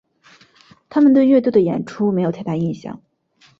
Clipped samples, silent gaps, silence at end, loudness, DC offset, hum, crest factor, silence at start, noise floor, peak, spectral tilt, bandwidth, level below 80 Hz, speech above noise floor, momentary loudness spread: under 0.1%; none; 0.65 s; -17 LUFS; under 0.1%; none; 16 dB; 0.9 s; -56 dBFS; -2 dBFS; -9 dB/octave; 7.2 kHz; -60 dBFS; 39 dB; 12 LU